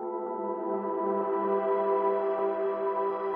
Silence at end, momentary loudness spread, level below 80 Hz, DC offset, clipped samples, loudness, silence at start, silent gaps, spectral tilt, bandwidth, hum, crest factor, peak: 0 s; 6 LU; -80 dBFS; under 0.1%; under 0.1%; -29 LUFS; 0 s; none; -10 dB/octave; 4.2 kHz; none; 14 dB; -16 dBFS